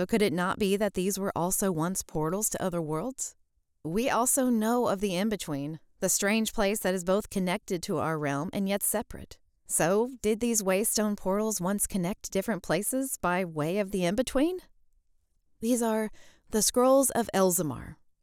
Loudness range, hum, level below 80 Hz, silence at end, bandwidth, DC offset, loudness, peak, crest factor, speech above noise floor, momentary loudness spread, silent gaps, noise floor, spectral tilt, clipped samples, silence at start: 3 LU; none; -52 dBFS; 0.3 s; 18 kHz; under 0.1%; -28 LUFS; -12 dBFS; 16 dB; 40 dB; 8 LU; none; -68 dBFS; -4 dB/octave; under 0.1%; 0 s